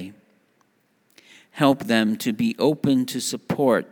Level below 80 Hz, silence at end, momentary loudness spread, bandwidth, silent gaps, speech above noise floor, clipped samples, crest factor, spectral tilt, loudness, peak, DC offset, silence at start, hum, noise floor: -68 dBFS; 0.05 s; 7 LU; over 20 kHz; none; 44 dB; under 0.1%; 20 dB; -5 dB/octave; -22 LUFS; -2 dBFS; under 0.1%; 0 s; none; -65 dBFS